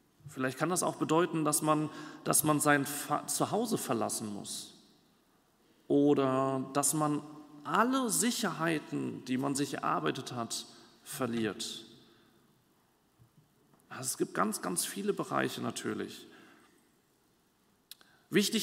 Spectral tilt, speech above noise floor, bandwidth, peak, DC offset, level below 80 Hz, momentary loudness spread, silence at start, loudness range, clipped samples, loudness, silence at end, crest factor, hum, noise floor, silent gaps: -3.5 dB/octave; 39 dB; 16 kHz; -12 dBFS; under 0.1%; -78 dBFS; 12 LU; 0.25 s; 9 LU; under 0.1%; -32 LUFS; 0 s; 22 dB; none; -71 dBFS; none